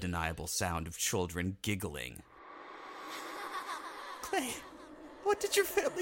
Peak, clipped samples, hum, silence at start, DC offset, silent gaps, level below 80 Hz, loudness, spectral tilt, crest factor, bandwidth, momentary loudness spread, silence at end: -16 dBFS; under 0.1%; none; 0 s; under 0.1%; none; -56 dBFS; -36 LUFS; -3.5 dB/octave; 20 dB; 17 kHz; 20 LU; 0 s